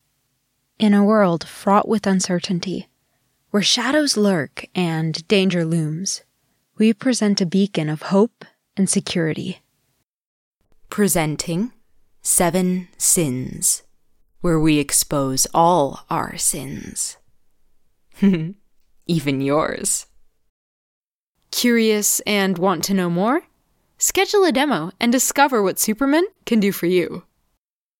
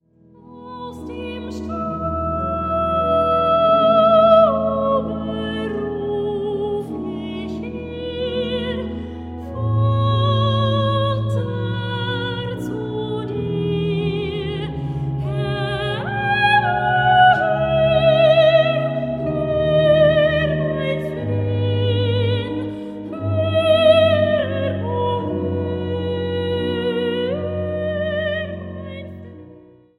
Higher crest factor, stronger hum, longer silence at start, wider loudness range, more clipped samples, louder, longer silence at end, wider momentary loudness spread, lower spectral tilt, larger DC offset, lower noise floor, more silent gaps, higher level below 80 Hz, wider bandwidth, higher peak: about the same, 18 dB vs 18 dB; neither; first, 0.8 s vs 0.45 s; second, 5 LU vs 8 LU; neither; about the same, -19 LUFS vs -19 LUFS; first, 0.8 s vs 0.4 s; second, 9 LU vs 15 LU; second, -4 dB/octave vs -8 dB/octave; neither; first, -75 dBFS vs -48 dBFS; first, 10.04-10.61 s, 20.49-21.32 s vs none; second, -48 dBFS vs -42 dBFS; first, 17 kHz vs 11 kHz; about the same, -4 dBFS vs -2 dBFS